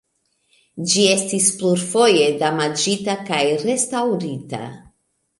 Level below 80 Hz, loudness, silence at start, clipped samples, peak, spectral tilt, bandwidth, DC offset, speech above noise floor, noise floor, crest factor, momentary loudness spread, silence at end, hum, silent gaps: -64 dBFS; -18 LUFS; 0.75 s; under 0.1%; -2 dBFS; -3 dB/octave; 11.5 kHz; under 0.1%; 49 dB; -67 dBFS; 18 dB; 14 LU; 0.6 s; none; none